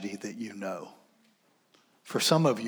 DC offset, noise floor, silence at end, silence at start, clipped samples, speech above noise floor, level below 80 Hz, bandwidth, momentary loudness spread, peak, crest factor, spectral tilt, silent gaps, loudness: under 0.1%; -68 dBFS; 0 s; 0 s; under 0.1%; 38 dB; -86 dBFS; over 20 kHz; 17 LU; -12 dBFS; 20 dB; -4.5 dB/octave; none; -30 LUFS